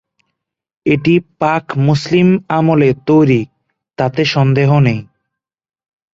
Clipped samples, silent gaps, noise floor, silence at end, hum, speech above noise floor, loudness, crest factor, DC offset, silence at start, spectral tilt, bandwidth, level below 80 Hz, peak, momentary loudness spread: under 0.1%; none; -78 dBFS; 1.1 s; none; 66 dB; -13 LUFS; 12 dB; under 0.1%; 0.85 s; -7.5 dB/octave; 7.6 kHz; -48 dBFS; -2 dBFS; 7 LU